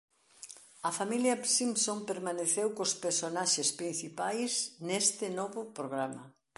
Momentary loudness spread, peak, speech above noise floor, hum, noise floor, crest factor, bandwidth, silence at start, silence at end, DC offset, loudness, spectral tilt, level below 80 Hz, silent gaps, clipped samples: 11 LU; -14 dBFS; 20 dB; none; -53 dBFS; 20 dB; 12 kHz; 0.4 s; 0.3 s; under 0.1%; -32 LUFS; -2 dB/octave; -84 dBFS; none; under 0.1%